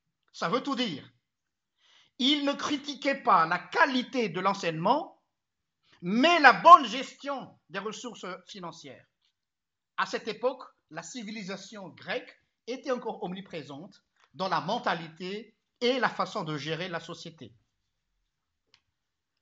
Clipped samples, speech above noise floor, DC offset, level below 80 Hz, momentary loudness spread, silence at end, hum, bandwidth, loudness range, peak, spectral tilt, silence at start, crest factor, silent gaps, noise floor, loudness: under 0.1%; over 62 dB; under 0.1%; -80 dBFS; 19 LU; 1.95 s; none; 8 kHz; 15 LU; -2 dBFS; -4 dB/octave; 0.35 s; 28 dB; none; under -90 dBFS; -26 LUFS